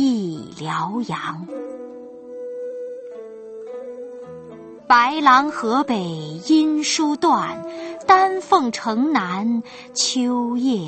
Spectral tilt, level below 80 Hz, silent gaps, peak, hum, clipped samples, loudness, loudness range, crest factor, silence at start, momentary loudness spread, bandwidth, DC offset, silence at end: -3.5 dB/octave; -64 dBFS; none; -2 dBFS; none; under 0.1%; -19 LUFS; 14 LU; 20 dB; 0 s; 21 LU; 8.8 kHz; under 0.1%; 0 s